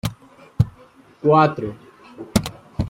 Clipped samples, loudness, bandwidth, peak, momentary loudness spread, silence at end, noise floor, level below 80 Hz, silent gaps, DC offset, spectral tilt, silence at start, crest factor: under 0.1%; -21 LUFS; 16 kHz; -2 dBFS; 17 LU; 0 s; -49 dBFS; -42 dBFS; none; under 0.1%; -6.5 dB/octave; 0.05 s; 20 dB